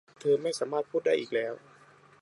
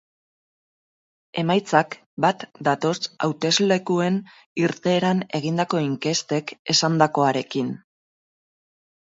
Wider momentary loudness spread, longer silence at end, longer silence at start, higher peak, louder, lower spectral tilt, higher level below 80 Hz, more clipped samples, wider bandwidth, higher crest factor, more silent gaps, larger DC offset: about the same, 7 LU vs 8 LU; second, 0.65 s vs 1.25 s; second, 0.2 s vs 1.35 s; second, -16 dBFS vs -2 dBFS; second, -30 LUFS vs -22 LUFS; about the same, -4.5 dB/octave vs -4.5 dB/octave; second, -82 dBFS vs -68 dBFS; neither; first, 11.5 kHz vs 8 kHz; second, 16 dB vs 22 dB; second, none vs 2.06-2.17 s, 4.46-4.56 s, 6.59-6.65 s; neither